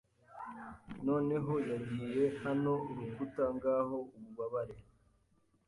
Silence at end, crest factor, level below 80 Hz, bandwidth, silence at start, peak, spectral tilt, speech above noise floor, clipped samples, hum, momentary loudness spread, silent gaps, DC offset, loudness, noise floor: 0.85 s; 16 dB; -68 dBFS; 11.5 kHz; 0.3 s; -20 dBFS; -9 dB/octave; 37 dB; under 0.1%; none; 15 LU; none; under 0.1%; -36 LUFS; -73 dBFS